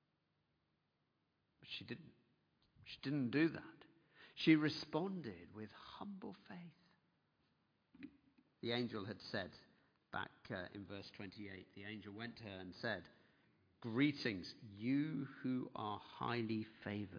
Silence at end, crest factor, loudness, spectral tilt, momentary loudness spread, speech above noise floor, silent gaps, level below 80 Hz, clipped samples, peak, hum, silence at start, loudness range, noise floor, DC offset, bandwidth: 0 s; 26 dB; -43 LUFS; -4.5 dB/octave; 17 LU; 41 dB; none; -82 dBFS; under 0.1%; -20 dBFS; none; 1.65 s; 10 LU; -84 dBFS; under 0.1%; 5.4 kHz